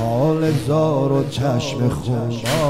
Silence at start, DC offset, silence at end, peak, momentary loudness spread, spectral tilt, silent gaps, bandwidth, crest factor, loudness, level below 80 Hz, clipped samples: 0 s; 0.7%; 0 s; -8 dBFS; 4 LU; -6.5 dB/octave; none; 16 kHz; 12 dB; -19 LUFS; -44 dBFS; under 0.1%